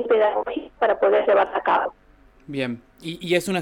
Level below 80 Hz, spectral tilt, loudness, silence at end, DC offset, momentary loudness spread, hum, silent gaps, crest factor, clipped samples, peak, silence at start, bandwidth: -56 dBFS; -5 dB/octave; -22 LUFS; 0 s; under 0.1%; 14 LU; 50 Hz at -70 dBFS; none; 16 dB; under 0.1%; -6 dBFS; 0 s; 18 kHz